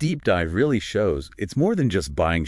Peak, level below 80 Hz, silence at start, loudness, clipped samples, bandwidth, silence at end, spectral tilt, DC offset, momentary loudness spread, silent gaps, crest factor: -8 dBFS; -40 dBFS; 0 s; -23 LUFS; under 0.1%; 12 kHz; 0 s; -6.5 dB/octave; under 0.1%; 4 LU; none; 14 dB